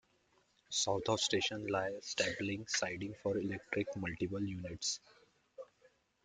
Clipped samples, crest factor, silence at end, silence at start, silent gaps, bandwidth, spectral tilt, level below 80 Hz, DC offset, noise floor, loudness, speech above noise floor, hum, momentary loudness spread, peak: under 0.1%; 20 dB; 0.6 s; 0.7 s; none; 10 kHz; -3 dB/octave; -68 dBFS; under 0.1%; -74 dBFS; -37 LUFS; 36 dB; none; 8 LU; -20 dBFS